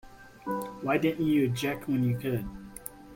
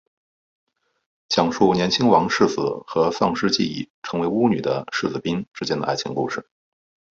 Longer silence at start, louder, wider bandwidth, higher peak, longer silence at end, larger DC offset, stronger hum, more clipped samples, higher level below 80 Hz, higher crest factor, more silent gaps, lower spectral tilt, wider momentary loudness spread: second, 0.05 s vs 1.3 s; second, -29 LUFS vs -21 LUFS; first, 16.5 kHz vs 7.8 kHz; second, -14 dBFS vs -2 dBFS; second, 0 s vs 0.75 s; neither; neither; neither; about the same, -54 dBFS vs -56 dBFS; about the same, 16 dB vs 20 dB; second, none vs 3.90-4.02 s, 5.47-5.51 s; first, -6.5 dB/octave vs -5 dB/octave; first, 16 LU vs 10 LU